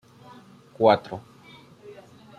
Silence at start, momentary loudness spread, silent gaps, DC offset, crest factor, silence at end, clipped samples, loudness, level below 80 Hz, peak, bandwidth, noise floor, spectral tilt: 0.8 s; 26 LU; none; under 0.1%; 24 dB; 0.45 s; under 0.1%; -22 LUFS; -70 dBFS; -4 dBFS; 10.5 kHz; -50 dBFS; -7 dB/octave